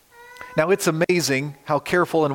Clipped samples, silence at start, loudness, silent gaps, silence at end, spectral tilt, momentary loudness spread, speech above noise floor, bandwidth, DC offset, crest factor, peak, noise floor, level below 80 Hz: under 0.1%; 0.2 s; -21 LUFS; none; 0 s; -4.5 dB/octave; 6 LU; 22 dB; 17 kHz; under 0.1%; 16 dB; -6 dBFS; -42 dBFS; -60 dBFS